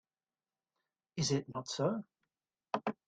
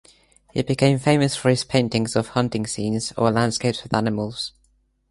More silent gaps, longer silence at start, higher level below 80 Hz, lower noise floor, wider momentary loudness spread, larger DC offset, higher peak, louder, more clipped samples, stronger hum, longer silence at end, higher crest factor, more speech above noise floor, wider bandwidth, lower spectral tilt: neither; first, 1.15 s vs 0.55 s; second, -74 dBFS vs -52 dBFS; first, under -90 dBFS vs -64 dBFS; about the same, 8 LU vs 9 LU; neither; second, -18 dBFS vs -2 dBFS; second, -37 LUFS vs -22 LUFS; neither; neither; second, 0.15 s vs 0.6 s; about the same, 22 dB vs 20 dB; first, over 53 dB vs 43 dB; second, 9.4 kHz vs 11.5 kHz; about the same, -4.5 dB/octave vs -5.5 dB/octave